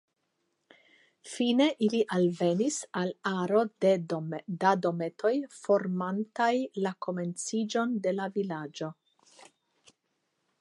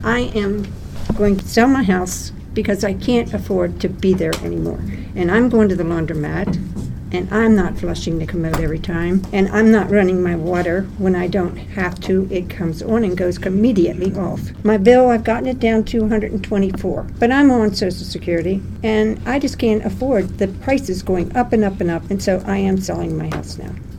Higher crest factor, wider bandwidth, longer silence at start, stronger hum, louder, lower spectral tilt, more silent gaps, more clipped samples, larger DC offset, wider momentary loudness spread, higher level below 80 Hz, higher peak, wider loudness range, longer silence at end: about the same, 20 dB vs 18 dB; second, 11.5 kHz vs 17.5 kHz; first, 1.25 s vs 0 s; neither; second, -29 LUFS vs -18 LUFS; about the same, -5.5 dB/octave vs -6.5 dB/octave; neither; neither; neither; about the same, 9 LU vs 10 LU; second, -82 dBFS vs -32 dBFS; second, -10 dBFS vs 0 dBFS; first, 6 LU vs 3 LU; first, 1.7 s vs 0 s